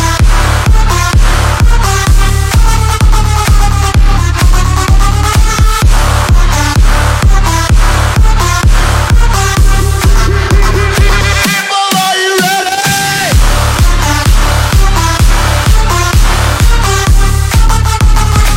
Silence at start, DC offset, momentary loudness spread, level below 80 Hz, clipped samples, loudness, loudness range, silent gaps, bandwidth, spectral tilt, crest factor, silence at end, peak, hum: 0 s; under 0.1%; 1 LU; -8 dBFS; 0.2%; -9 LUFS; 0 LU; none; 16.5 kHz; -4 dB/octave; 6 dB; 0 s; 0 dBFS; none